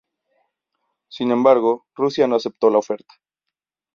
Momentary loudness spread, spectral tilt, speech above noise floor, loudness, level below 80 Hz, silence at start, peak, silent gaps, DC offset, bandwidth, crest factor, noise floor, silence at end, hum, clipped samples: 14 LU; -6 dB/octave; 66 dB; -19 LUFS; -68 dBFS; 1.15 s; -2 dBFS; none; under 0.1%; 7.2 kHz; 20 dB; -84 dBFS; 1 s; none; under 0.1%